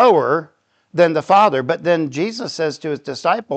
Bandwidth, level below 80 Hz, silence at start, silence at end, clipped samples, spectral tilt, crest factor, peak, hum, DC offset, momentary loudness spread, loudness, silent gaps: 8.6 kHz; -70 dBFS; 0 s; 0 s; under 0.1%; -5.5 dB/octave; 16 dB; -2 dBFS; none; under 0.1%; 10 LU; -17 LUFS; none